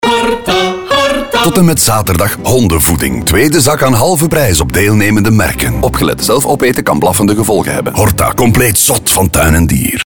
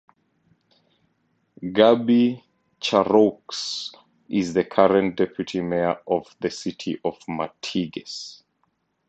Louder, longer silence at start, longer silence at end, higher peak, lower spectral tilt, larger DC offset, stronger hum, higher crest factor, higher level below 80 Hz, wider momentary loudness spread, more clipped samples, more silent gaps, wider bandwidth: first, -9 LUFS vs -22 LUFS; second, 0 s vs 1.6 s; second, 0.05 s vs 0.75 s; about the same, 0 dBFS vs -2 dBFS; about the same, -4.5 dB/octave vs -5.5 dB/octave; neither; neither; second, 10 dB vs 22 dB; first, -24 dBFS vs -60 dBFS; second, 4 LU vs 14 LU; neither; neither; first, over 20 kHz vs 8.2 kHz